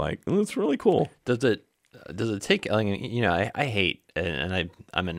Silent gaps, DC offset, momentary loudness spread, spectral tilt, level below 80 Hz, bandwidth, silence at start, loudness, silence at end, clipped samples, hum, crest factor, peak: none; under 0.1%; 7 LU; -5.5 dB/octave; -52 dBFS; 15.5 kHz; 0 s; -26 LUFS; 0 s; under 0.1%; none; 18 dB; -8 dBFS